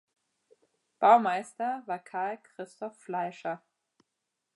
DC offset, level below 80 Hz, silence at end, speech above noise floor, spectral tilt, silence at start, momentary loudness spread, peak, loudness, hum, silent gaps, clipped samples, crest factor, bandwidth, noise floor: under 0.1%; -90 dBFS; 1 s; 56 dB; -5 dB/octave; 1 s; 20 LU; -8 dBFS; -29 LUFS; none; none; under 0.1%; 22 dB; 11.5 kHz; -84 dBFS